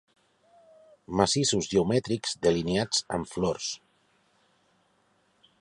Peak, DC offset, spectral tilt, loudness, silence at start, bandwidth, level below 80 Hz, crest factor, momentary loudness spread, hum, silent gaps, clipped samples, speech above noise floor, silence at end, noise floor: -6 dBFS; under 0.1%; -4 dB/octave; -27 LUFS; 1.1 s; 11.5 kHz; -56 dBFS; 24 dB; 9 LU; none; none; under 0.1%; 41 dB; 1.85 s; -68 dBFS